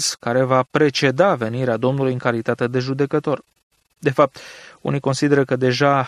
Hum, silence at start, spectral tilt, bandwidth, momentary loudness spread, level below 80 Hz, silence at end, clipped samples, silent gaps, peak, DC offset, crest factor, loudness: none; 0 s; -5.5 dB/octave; 14 kHz; 8 LU; -62 dBFS; 0 s; under 0.1%; 3.63-3.70 s; -2 dBFS; under 0.1%; 18 dB; -19 LUFS